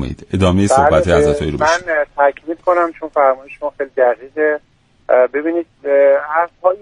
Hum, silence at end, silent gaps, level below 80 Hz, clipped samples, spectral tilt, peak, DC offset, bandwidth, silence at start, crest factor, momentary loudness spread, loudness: none; 0.05 s; none; -36 dBFS; under 0.1%; -6 dB/octave; 0 dBFS; under 0.1%; 11 kHz; 0 s; 14 dB; 10 LU; -15 LUFS